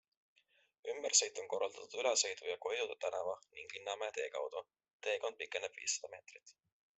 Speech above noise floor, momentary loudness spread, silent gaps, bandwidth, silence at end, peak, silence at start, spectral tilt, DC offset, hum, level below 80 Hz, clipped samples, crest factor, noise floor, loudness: 24 dB; 17 LU; 4.93-5.00 s; 8.2 kHz; 0.45 s; -16 dBFS; 0.85 s; 1.5 dB/octave; under 0.1%; none; -88 dBFS; under 0.1%; 24 dB; -64 dBFS; -38 LUFS